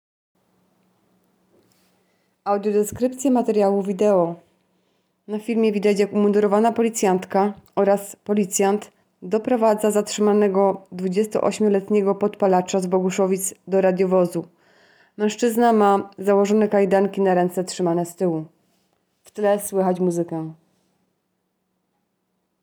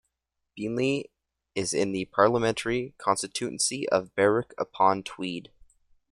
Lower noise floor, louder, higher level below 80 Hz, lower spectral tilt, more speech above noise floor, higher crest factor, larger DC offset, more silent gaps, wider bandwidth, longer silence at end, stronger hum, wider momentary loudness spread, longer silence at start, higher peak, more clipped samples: second, -73 dBFS vs -82 dBFS; first, -20 LUFS vs -27 LUFS; about the same, -66 dBFS vs -62 dBFS; first, -6 dB/octave vs -4 dB/octave; about the same, 53 dB vs 56 dB; second, 16 dB vs 22 dB; neither; neither; first, over 20 kHz vs 14.5 kHz; first, 2.1 s vs 0.7 s; neither; second, 8 LU vs 11 LU; first, 2.45 s vs 0.55 s; about the same, -6 dBFS vs -6 dBFS; neither